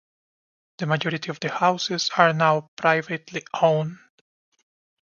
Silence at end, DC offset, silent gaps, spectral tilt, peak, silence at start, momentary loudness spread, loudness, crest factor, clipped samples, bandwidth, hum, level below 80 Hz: 1.1 s; under 0.1%; 2.68-2.77 s; -4.5 dB/octave; -2 dBFS; 0.8 s; 12 LU; -23 LUFS; 24 dB; under 0.1%; 7.2 kHz; none; -72 dBFS